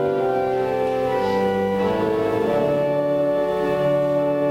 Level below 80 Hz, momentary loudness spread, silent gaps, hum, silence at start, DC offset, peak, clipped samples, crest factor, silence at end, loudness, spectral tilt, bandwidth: -50 dBFS; 2 LU; none; none; 0 s; under 0.1%; -10 dBFS; under 0.1%; 10 dB; 0 s; -21 LUFS; -7.5 dB/octave; 16 kHz